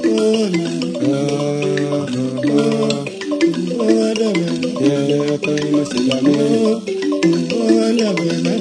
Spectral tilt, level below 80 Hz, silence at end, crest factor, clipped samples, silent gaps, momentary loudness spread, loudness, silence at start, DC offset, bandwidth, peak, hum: -5.5 dB/octave; -62 dBFS; 0 s; 16 dB; under 0.1%; none; 5 LU; -17 LUFS; 0 s; under 0.1%; 10.5 kHz; -2 dBFS; none